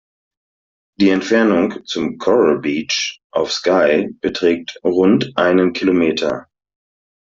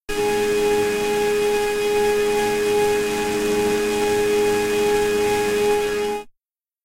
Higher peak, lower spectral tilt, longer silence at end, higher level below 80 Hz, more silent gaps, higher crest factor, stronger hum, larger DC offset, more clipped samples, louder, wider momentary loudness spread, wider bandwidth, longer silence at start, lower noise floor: first, -2 dBFS vs -8 dBFS; first, -5 dB/octave vs -3.5 dB/octave; first, 0.85 s vs 0.55 s; second, -56 dBFS vs -44 dBFS; first, 3.24-3.30 s vs none; about the same, 14 dB vs 12 dB; neither; neither; neither; first, -16 LUFS vs -20 LUFS; first, 8 LU vs 3 LU; second, 7.6 kHz vs 16 kHz; first, 1 s vs 0.1 s; first, under -90 dBFS vs -80 dBFS